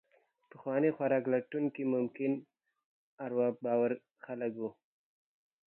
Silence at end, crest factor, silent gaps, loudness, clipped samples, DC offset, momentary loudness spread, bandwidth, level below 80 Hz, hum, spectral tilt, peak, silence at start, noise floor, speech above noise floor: 0.95 s; 18 dB; 2.85-3.18 s; -34 LUFS; under 0.1%; under 0.1%; 12 LU; 3.8 kHz; -88 dBFS; none; -11 dB/octave; -18 dBFS; 0.55 s; -65 dBFS; 31 dB